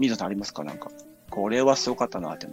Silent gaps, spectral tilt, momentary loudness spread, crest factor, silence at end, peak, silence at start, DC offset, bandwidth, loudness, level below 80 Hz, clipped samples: none; -4 dB/octave; 16 LU; 20 dB; 0 s; -6 dBFS; 0 s; under 0.1%; 16 kHz; -26 LUFS; -60 dBFS; under 0.1%